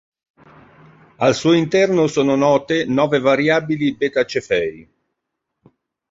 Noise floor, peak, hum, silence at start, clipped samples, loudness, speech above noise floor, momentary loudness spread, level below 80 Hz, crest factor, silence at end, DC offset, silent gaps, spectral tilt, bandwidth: -78 dBFS; -2 dBFS; none; 1.2 s; under 0.1%; -17 LUFS; 62 dB; 6 LU; -56 dBFS; 16 dB; 1.3 s; under 0.1%; none; -5.5 dB/octave; 7.8 kHz